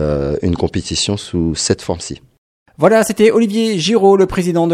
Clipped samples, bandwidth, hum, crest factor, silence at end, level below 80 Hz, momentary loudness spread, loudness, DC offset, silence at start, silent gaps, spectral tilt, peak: under 0.1%; 15 kHz; none; 14 dB; 0 s; -36 dBFS; 8 LU; -14 LUFS; under 0.1%; 0 s; 2.38-2.66 s; -5 dB/octave; 0 dBFS